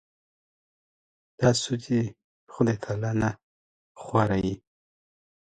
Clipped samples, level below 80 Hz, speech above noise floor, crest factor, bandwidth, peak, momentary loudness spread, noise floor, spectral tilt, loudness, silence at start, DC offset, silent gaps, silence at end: under 0.1%; -54 dBFS; over 65 dB; 22 dB; 9.4 kHz; -8 dBFS; 12 LU; under -90 dBFS; -6 dB/octave; -27 LUFS; 1.4 s; under 0.1%; 2.24-2.47 s, 3.43-3.95 s; 1 s